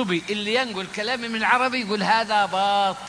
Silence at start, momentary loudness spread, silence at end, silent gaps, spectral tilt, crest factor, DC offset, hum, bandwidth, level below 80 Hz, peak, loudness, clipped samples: 0 s; 6 LU; 0 s; none; -3.5 dB/octave; 18 dB; under 0.1%; none; 10.5 kHz; -62 dBFS; -4 dBFS; -22 LUFS; under 0.1%